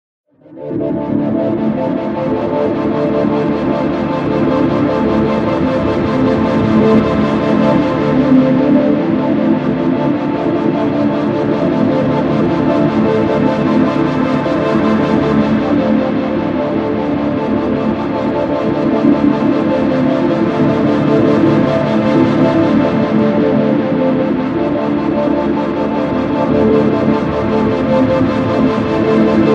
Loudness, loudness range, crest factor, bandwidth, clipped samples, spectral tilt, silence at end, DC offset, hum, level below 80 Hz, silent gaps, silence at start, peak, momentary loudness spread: -14 LUFS; 3 LU; 12 dB; 7.6 kHz; under 0.1%; -8.5 dB/octave; 0 s; under 0.1%; none; -38 dBFS; none; 0.5 s; 0 dBFS; 5 LU